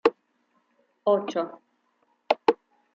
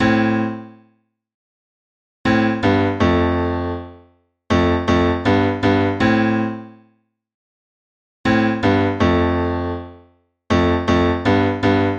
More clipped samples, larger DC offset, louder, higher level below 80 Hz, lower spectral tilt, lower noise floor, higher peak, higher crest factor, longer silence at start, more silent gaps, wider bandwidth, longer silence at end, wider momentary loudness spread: neither; neither; second, -27 LUFS vs -18 LUFS; second, -76 dBFS vs -38 dBFS; second, -5.5 dB/octave vs -7 dB/octave; first, -70 dBFS vs -62 dBFS; about the same, -2 dBFS vs -4 dBFS; first, 26 dB vs 16 dB; about the same, 0.05 s vs 0 s; second, none vs 1.34-2.24 s, 7.34-8.24 s; about the same, 7.6 kHz vs 8 kHz; first, 0.4 s vs 0 s; about the same, 10 LU vs 8 LU